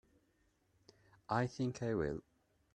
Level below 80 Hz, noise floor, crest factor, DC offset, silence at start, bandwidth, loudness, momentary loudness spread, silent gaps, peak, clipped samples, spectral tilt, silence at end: -64 dBFS; -77 dBFS; 22 dB; under 0.1%; 1.3 s; 9.4 kHz; -39 LUFS; 4 LU; none; -20 dBFS; under 0.1%; -7 dB/octave; 0.55 s